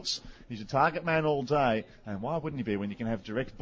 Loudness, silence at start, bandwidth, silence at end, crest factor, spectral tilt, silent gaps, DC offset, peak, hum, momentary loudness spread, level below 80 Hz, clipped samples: -30 LUFS; 0 s; 7.8 kHz; 0 s; 18 dB; -5.5 dB/octave; none; under 0.1%; -12 dBFS; none; 10 LU; -56 dBFS; under 0.1%